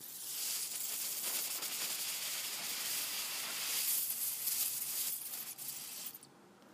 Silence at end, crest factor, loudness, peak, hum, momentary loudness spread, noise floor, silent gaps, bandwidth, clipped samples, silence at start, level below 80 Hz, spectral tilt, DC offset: 0 s; 18 dB; -36 LUFS; -22 dBFS; none; 9 LU; -60 dBFS; none; 15.5 kHz; under 0.1%; 0 s; under -90 dBFS; 2 dB/octave; under 0.1%